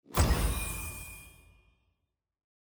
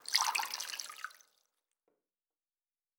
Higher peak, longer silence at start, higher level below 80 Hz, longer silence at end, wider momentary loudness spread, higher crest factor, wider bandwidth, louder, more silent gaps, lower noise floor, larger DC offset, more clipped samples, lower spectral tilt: about the same, -12 dBFS vs -10 dBFS; about the same, 0.1 s vs 0.05 s; first, -38 dBFS vs under -90 dBFS; second, 1.45 s vs 1.8 s; about the same, 17 LU vs 17 LU; second, 22 dB vs 30 dB; about the same, over 20 kHz vs over 20 kHz; first, -32 LUFS vs -35 LUFS; neither; second, -82 dBFS vs under -90 dBFS; neither; neither; first, -4.5 dB/octave vs 5 dB/octave